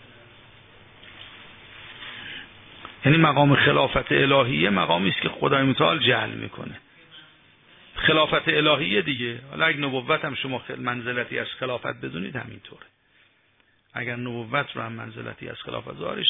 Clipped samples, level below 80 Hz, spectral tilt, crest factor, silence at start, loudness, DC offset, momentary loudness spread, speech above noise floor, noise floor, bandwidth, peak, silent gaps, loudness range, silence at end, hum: under 0.1%; -54 dBFS; -8.5 dB/octave; 20 dB; 1.05 s; -22 LUFS; under 0.1%; 21 LU; 40 dB; -63 dBFS; 3.9 kHz; -6 dBFS; none; 12 LU; 0 s; none